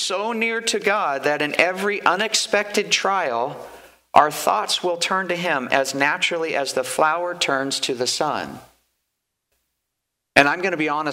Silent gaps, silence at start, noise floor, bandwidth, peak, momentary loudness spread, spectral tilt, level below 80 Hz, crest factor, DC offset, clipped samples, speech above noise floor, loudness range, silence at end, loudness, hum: none; 0 s; -79 dBFS; 16 kHz; 0 dBFS; 6 LU; -2 dB/octave; -64 dBFS; 22 dB; under 0.1%; under 0.1%; 58 dB; 4 LU; 0 s; -20 LUFS; none